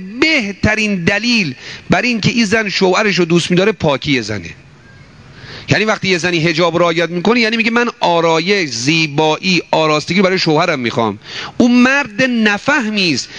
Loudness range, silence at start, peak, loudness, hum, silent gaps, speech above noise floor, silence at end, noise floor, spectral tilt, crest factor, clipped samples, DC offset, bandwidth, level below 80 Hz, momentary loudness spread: 3 LU; 0 s; 0 dBFS; -13 LUFS; none; none; 27 dB; 0 s; -40 dBFS; -4.5 dB/octave; 14 dB; under 0.1%; 0.1%; 10 kHz; -44 dBFS; 5 LU